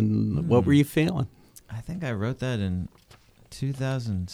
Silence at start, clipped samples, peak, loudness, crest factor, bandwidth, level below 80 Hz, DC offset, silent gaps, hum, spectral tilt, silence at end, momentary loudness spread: 0 s; under 0.1%; -8 dBFS; -26 LUFS; 18 dB; 15.5 kHz; -50 dBFS; under 0.1%; none; none; -7.5 dB/octave; 0 s; 17 LU